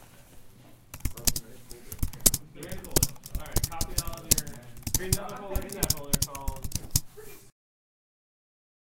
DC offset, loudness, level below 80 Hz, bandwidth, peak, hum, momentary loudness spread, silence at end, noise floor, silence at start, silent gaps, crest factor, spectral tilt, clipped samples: under 0.1%; -29 LUFS; -38 dBFS; 17 kHz; 0 dBFS; none; 19 LU; 1.4 s; -51 dBFS; 0 s; none; 32 dB; -3 dB/octave; under 0.1%